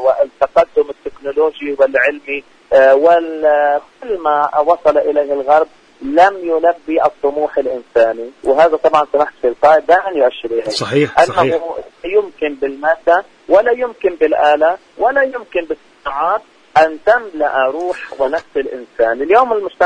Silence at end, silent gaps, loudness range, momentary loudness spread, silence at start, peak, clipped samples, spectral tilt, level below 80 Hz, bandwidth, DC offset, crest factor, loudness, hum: 0 s; none; 3 LU; 10 LU; 0 s; 0 dBFS; under 0.1%; -5 dB/octave; -52 dBFS; 10 kHz; under 0.1%; 14 dB; -14 LUFS; none